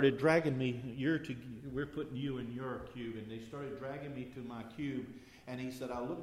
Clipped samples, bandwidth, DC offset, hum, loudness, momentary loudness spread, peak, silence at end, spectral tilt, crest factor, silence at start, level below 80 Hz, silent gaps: under 0.1%; 15 kHz; under 0.1%; none; -39 LUFS; 14 LU; -16 dBFS; 0 s; -7 dB/octave; 22 dB; 0 s; -64 dBFS; none